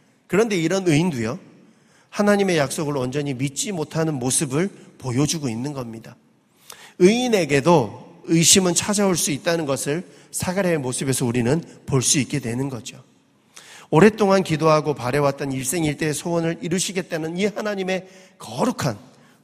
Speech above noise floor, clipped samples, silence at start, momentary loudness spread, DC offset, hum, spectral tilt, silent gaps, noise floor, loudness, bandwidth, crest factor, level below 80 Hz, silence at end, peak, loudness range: 34 dB; under 0.1%; 0.3 s; 12 LU; under 0.1%; none; -4.5 dB/octave; none; -54 dBFS; -21 LUFS; 15.5 kHz; 22 dB; -54 dBFS; 0.45 s; 0 dBFS; 6 LU